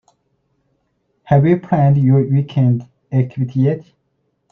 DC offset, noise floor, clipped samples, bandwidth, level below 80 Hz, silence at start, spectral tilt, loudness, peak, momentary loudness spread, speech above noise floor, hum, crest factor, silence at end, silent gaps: under 0.1%; -67 dBFS; under 0.1%; 3.9 kHz; -52 dBFS; 1.3 s; -11 dB/octave; -16 LUFS; -2 dBFS; 7 LU; 53 dB; none; 16 dB; 0.7 s; none